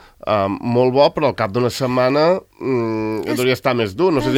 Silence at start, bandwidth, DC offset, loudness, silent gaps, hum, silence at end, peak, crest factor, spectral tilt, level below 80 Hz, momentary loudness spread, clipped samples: 0.25 s; 16.5 kHz; under 0.1%; -18 LUFS; none; none; 0 s; 0 dBFS; 16 dB; -6 dB/octave; -50 dBFS; 6 LU; under 0.1%